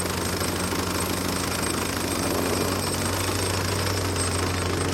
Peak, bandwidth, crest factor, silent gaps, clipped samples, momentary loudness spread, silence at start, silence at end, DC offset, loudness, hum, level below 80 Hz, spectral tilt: -10 dBFS; 16.5 kHz; 14 dB; none; under 0.1%; 1 LU; 0 s; 0 s; under 0.1%; -25 LUFS; none; -44 dBFS; -3.5 dB/octave